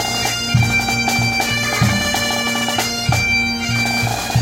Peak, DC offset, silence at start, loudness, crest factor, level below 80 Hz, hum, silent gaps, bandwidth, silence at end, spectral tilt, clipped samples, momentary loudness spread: -2 dBFS; under 0.1%; 0 s; -16 LUFS; 14 dB; -36 dBFS; none; none; 16 kHz; 0 s; -3.5 dB/octave; under 0.1%; 3 LU